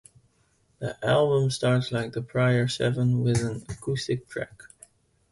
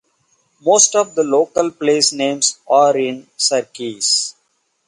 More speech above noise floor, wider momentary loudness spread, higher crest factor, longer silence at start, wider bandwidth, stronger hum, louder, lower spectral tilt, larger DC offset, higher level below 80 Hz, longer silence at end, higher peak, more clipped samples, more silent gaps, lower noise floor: second, 41 dB vs 50 dB; first, 13 LU vs 9 LU; about the same, 16 dB vs 18 dB; first, 0.8 s vs 0.65 s; about the same, 11.5 kHz vs 11.5 kHz; neither; second, -26 LUFS vs -15 LUFS; first, -6 dB/octave vs -1.5 dB/octave; neither; first, -54 dBFS vs -68 dBFS; first, 0.7 s vs 0.55 s; second, -10 dBFS vs 0 dBFS; neither; neither; about the same, -66 dBFS vs -65 dBFS